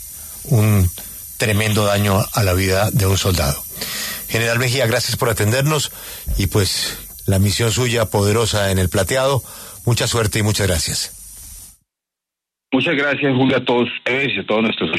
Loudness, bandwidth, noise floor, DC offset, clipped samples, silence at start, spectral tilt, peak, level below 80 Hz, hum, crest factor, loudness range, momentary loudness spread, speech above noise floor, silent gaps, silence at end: -18 LUFS; 13.5 kHz; -85 dBFS; under 0.1%; under 0.1%; 0 s; -4.5 dB/octave; -4 dBFS; -36 dBFS; none; 14 dB; 3 LU; 9 LU; 68 dB; none; 0 s